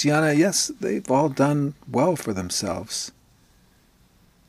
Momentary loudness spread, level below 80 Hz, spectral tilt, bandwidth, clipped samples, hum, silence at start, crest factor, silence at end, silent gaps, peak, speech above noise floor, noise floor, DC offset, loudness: 9 LU; -58 dBFS; -4.5 dB/octave; 15 kHz; under 0.1%; none; 0 s; 18 dB; 1.4 s; none; -6 dBFS; 36 dB; -58 dBFS; under 0.1%; -23 LUFS